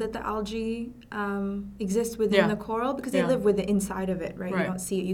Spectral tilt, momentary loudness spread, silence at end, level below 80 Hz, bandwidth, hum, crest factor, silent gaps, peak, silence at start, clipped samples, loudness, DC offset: -5.5 dB/octave; 9 LU; 0 s; -50 dBFS; 17 kHz; none; 22 dB; none; -6 dBFS; 0 s; under 0.1%; -28 LUFS; under 0.1%